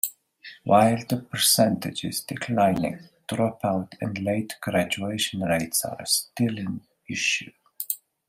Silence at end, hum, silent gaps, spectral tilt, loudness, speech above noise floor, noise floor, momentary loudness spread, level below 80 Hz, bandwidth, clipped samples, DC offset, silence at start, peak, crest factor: 0.35 s; none; none; -3.5 dB/octave; -25 LUFS; 23 dB; -48 dBFS; 14 LU; -62 dBFS; 16 kHz; under 0.1%; under 0.1%; 0.05 s; -4 dBFS; 20 dB